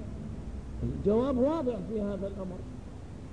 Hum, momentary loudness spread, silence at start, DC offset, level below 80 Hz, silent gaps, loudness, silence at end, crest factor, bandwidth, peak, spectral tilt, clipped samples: none; 16 LU; 0 s; 0.3%; -44 dBFS; none; -32 LUFS; 0 s; 16 dB; 10.5 kHz; -16 dBFS; -9 dB/octave; under 0.1%